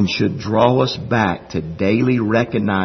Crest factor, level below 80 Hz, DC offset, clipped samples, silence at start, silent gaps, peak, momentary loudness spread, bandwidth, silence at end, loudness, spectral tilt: 16 dB; -48 dBFS; under 0.1%; under 0.1%; 0 s; none; 0 dBFS; 5 LU; 6.4 kHz; 0 s; -18 LUFS; -7 dB/octave